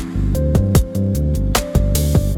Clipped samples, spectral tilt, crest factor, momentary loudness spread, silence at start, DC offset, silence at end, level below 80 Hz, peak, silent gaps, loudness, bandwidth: under 0.1%; -6 dB/octave; 14 dB; 4 LU; 0 s; under 0.1%; 0 s; -20 dBFS; -2 dBFS; none; -17 LUFS; 18 kHz